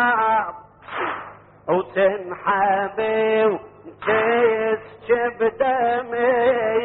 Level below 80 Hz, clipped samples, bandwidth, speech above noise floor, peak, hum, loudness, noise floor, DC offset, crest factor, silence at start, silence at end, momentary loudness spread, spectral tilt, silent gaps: -58 dBFS; under 0.1%; 4.1 kHz; 20 dB; -6 dBFS; none; -21 LUFS; -40 dBFS; under 0.1%; 14 dB; 0 s; 0 s; 12 LU; -2.5 dB/octave; none